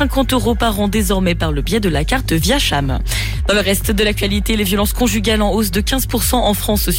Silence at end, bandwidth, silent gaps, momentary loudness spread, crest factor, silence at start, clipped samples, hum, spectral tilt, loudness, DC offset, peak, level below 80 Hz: 0 s; 17 kHz; none; 3 LU; 12 dB; 0 s; under 0.1%; none; -4.5 dB/octave; -16 LUFS; under 0.1%; -4 dBFS; -22 dBFS